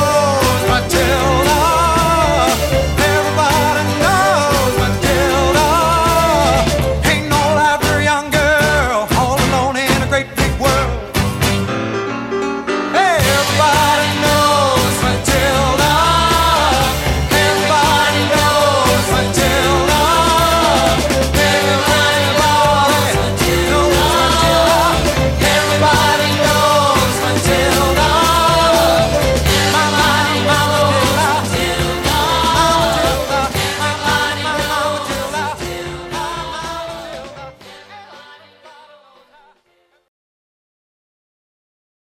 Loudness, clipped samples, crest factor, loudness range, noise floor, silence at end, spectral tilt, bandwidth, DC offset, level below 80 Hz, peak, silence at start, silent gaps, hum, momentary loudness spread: -13 LUFS; under 0.1%; 14 dB; 5 LU; -59 dBFS; 3.75 s; -4 dB/octave; 16.5 kHz; under 0.1%; -26 dBFS; 0 dBFS; 0 s; none; none; 7 LU